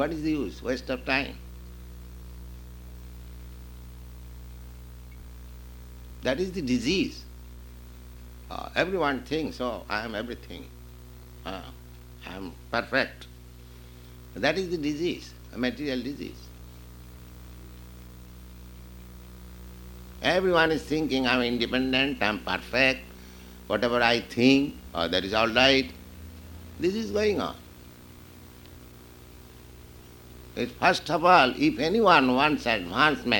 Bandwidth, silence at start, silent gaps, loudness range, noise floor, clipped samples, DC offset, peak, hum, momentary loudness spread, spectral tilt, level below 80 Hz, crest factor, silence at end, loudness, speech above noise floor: 19.5 kHz; 0 s; none; 21 LU; -48 dBFS; under 0.1%; under 0.1%; -4 dBFS; none; 24 LU; -5 dB/octave; -46 dBFS; 26 dB; 0 s; -25 LUFS; 22 dB